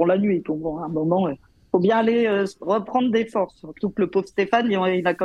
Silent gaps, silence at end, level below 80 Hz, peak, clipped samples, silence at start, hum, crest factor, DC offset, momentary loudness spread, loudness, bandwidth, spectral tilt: none; 0 s; -58 dBFS; -6 dBFS; under 0.1%; 0 s; none; 16 dB; under 0.1%; 8 LU; -22 LUFS; 9.6 kHz; -7.5 dB/octave